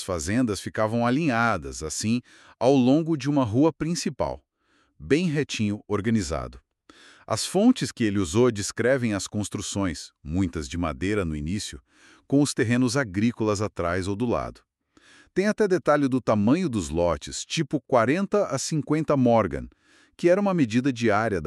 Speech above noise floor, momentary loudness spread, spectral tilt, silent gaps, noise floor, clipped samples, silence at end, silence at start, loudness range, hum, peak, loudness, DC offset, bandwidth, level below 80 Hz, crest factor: 43 dB; 9 LU; -5.5 dB/octave; none; -67 dBFS; under 0.1%; 0 s; 0 s; 4 LU; none; -6 dBFS; -24 LUFS; under 0.1%; 13 kHz; -48 dBFS; 18 dB